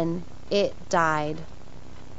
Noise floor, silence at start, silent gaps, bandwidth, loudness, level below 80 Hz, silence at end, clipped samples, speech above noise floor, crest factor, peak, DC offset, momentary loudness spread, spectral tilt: -45 dBFS; 0 s; none; 8 kHz; -26 LUFS; -50 dBFS; 0 s; under 0.1%; 20 dB; 20 dB; -8 dBFS; 2%; 24 LU; -5 dB/octave